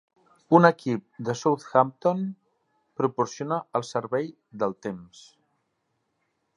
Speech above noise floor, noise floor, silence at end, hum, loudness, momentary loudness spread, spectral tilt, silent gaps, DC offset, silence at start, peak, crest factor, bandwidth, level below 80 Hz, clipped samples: 51 dB; -76 dBFS; 1.55 s; none; -25 LUFS; 17 LU; -6.5 dB/octave; none; under 0.1%; 0.5 s; -2 dBFS; 26 dB; 11 kHz; -72 dBFS; under 0.1%